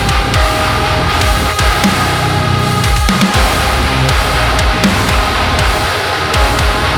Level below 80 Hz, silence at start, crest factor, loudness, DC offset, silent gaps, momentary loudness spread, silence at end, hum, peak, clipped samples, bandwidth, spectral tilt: -18 dBFS; 0 s; 12 dB; -12 LUFS; under 0.1%; none; 2 LU; 0 s; none; 0 dBFS; under 0.1%; 18 kHz; -4 dB/octave